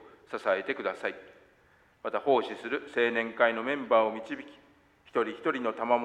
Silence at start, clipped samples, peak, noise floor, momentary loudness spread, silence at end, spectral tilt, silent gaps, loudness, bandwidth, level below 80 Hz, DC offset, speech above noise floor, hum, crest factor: 0 s; under 0.1%; -10 dBFS; -63 dBFS; 14 LU; 0 s; -5 dB/octave; none; -30 LUFS; 9.8 kHz; -74 dBFS; under 0.1%; 34 dB; none; 20 dB